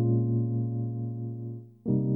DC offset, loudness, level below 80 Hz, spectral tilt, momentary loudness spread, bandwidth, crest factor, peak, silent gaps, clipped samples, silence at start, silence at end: under 0.1%; -31 LUFS; -62 dBFS; -15.5 dB/octave; 12 LU; 1.1 kHz; 14 dB; -14 dBFS; none; under 0.1%; 0 s; 0 s